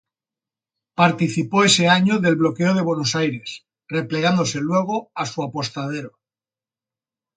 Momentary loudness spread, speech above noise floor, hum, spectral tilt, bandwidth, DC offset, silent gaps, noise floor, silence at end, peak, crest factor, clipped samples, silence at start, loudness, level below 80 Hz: 15 LU; over 71 dB; none; -4.5 dB/octave; 9.6 kHz; under 0.1%; none; under -90 dBFS; 1.3 s; -2 dBFS; 20 dB; under 0.1%; 1 s; -19 LUFS; -62 dBFS